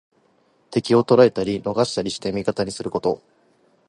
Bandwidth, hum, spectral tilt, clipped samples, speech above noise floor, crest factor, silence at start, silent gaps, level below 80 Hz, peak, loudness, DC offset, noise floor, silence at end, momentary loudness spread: 11.5 kHz; none; -5.5 dB/octave; under 0.1%; 41 dB; 20 dB; 0.7 s; none; -56 dBFS; -2 dBFS; -21 LUFS; under 0.1%; -61 dBFS; 0.7 s; 11 LU